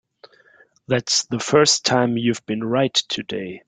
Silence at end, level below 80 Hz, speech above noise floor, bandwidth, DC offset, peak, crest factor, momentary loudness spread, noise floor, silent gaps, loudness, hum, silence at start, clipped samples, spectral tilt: 0.1 s; -60 dBFS; 35 dB; 10 kHz; under 0.1%; -2 dBFS; 18 dB; 10 LU; -55 dBFS; none; -19 LUFS; none; 0.9 s; under 0.1%; -3.5 dB/octave